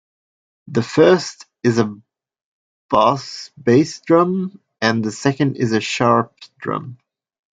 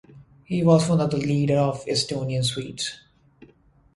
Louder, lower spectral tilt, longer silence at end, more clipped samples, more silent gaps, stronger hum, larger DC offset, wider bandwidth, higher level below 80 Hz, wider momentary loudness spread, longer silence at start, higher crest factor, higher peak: first, -18 LUFS vs -23 LUFS; about the same, -6 dB/octave vs -6 dB/octave; second, 0.65 s vs 1 s; neither; first, 2.44-2.89 s vs none; neither; neither; second, 9.2 kHz vs 11.5 kHz; about the same, -58 dBFS vs -54 dBFS; first, 14 LU vs 11 LU; first, 0.7 s vs 0.15 s; about the same, 18 dB vs 20 dB; first, 0 dBFS vs -4 dBFS